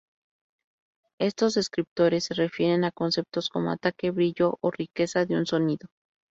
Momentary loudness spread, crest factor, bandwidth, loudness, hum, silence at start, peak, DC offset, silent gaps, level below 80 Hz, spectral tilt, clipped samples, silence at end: 5 LU; 18 dB; 8 kHz; -26 LUFS; none; 1.2 s; -10 dBFS; under 0.1%; 1.87-1.96 s; -66 dBFS; -5.5 dB/octave; under 0.1%; 0.45 s